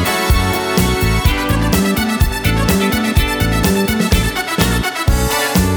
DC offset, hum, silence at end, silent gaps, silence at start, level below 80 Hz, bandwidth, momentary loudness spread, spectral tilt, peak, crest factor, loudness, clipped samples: under 0.1%; none; 0 s; none; 0 s; -20 dBFS; over 20 kHz; 2 LU; -4.5 dB/octave; 0 dBFS; 14 dB; -15 LUFS; under 0.1%